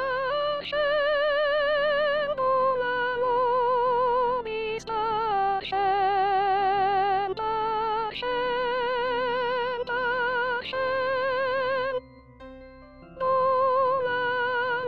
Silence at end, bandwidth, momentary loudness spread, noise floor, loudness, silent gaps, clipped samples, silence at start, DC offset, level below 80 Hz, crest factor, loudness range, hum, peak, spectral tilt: 0 s; 7 kHz; 5 LU; -47 dBFS; -25 LUFS; none; under 0.1%; 0 s; 0.3%; -56 dBFS; 12 dB; 3 LU; none; -14 dBFS; -4.5 dB/octave